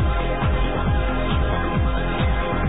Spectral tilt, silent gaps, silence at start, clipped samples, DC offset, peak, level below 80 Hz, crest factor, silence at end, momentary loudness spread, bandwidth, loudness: -10.5 dB/octave; none; 0 s; under 0.1%; 2%; -10 dBFS; -24 dBFS; 12 dB; 0 s; 1 LU; 4 kHz; -22 LUFS